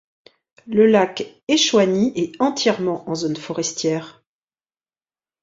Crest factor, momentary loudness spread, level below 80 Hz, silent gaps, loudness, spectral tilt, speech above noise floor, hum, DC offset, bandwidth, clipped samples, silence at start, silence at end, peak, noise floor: 18 dB; 10 LU; -64 dBFS; 1.43-1.47 s; -19 LUFS; -4 dB/octave; over 71 dB; none; under 0.1%; 7.8 kHz; under 0.1%; 0.65 s; 1.3 s; -2 dBFS; under -90 dBFS